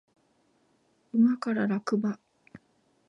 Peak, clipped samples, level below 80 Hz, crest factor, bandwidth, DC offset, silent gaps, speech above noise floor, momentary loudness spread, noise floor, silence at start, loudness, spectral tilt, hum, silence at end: -14 dBFS; under 0.1%; -80 dBFS; 16 dB; 7.8 kHz; under 0.1%; none; 43 dB; 9 LU; -69 dBFS; 1.15 s; -28 LUFS; -7.5 dB/octave; none; 0.5 s